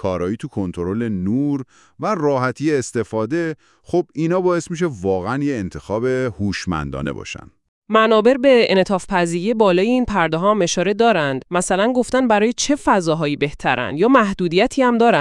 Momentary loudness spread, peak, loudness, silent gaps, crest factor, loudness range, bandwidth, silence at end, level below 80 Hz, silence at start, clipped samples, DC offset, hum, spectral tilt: 10 LU; 0 dBFS; -18 LUFS; 7.68-7.82 s; 18 dB; 5 LU; 12 kHz; 0 s; -46 dBFS; 0 s; under 0.1%; under 0.1%; none; -5 dB/octave